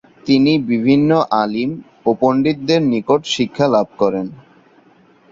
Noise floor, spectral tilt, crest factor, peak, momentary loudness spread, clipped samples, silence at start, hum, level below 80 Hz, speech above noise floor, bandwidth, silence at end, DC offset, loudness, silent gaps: -50 dBFS; -6 dB/octave; 16 dB; 0 dBFS; 8 LU; under 0.1%; 0.25 s; none; -56 dBFS; 35 dB; 7.8 kHz; 0.95 s; under 0.1%; -16 LUFS; none